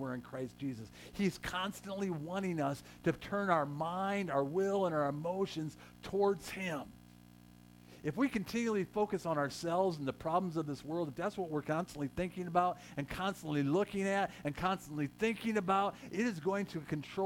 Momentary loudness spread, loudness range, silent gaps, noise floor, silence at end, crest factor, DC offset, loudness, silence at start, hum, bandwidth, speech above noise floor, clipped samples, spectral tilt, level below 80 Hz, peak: 8 LU; 3 LU; none; -58 dBFS; 0 s; 20 dB; under 0.1%; -36 LUFS; 0 s; 60 Hz at -60 dBFS; 17 kHz; 22 dB; under 0.1%; -6 dB/octave; -64 dBFS; -16 dBFS